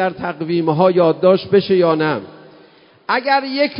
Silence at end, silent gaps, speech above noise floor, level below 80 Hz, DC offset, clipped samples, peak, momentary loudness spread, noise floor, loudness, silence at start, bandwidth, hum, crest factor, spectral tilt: 0 s; none; 32 dB; -58 dBFS; under 0.1%; under 0.1%; 0 dBFS; 8 LU; -48 dBFS; -16 LUFS; 0 s; 5.4 kHz; none; 16 dB; -11 dB/octave